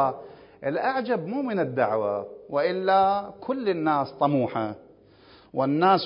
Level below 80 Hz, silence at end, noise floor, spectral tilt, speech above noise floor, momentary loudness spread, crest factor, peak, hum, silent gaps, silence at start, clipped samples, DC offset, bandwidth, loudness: -66 dBFS; 0 s; -53 dBFS; -10.5 dB/octave; 29 dB; 11 LU; 16 dB; -8 dBFS; none; none; 0 s; under 0.1%; under 0.1%; 5.4 kHz; -26 LUFS